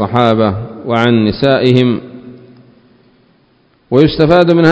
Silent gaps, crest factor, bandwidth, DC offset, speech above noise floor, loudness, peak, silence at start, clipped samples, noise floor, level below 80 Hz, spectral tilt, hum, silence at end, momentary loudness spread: none; 12 dB; 8 kHz; under 0.1%; 43 dB; -11 LUFS; 0 dBFS; 0 s; 0.6%; -52 dBFS; -40 dBFS; -8 dB/octave; none; 0 s; 9 LU